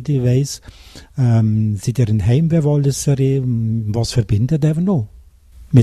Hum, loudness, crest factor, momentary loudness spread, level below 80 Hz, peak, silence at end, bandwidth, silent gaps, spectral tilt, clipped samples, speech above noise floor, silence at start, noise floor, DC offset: none; -17 LUFS; 16 dB; 5 LU; -38 dBFS; 0 dBFS; 0 s; 13 kHz; none; -7 dB/octave; under 0.1%; 26 dB; 0 s; -42 dBFS; under 0.1%